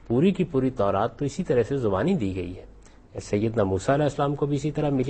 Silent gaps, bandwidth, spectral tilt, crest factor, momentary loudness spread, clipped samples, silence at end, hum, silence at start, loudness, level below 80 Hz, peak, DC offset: none; 8.8 kHz; -7.5 dB/octave; 14 dB; 9 LU; under 0.1%; 0 s; none; 0.05 s; -25 LUFS; -48 dBFS; -10 dBFS; under 0.1%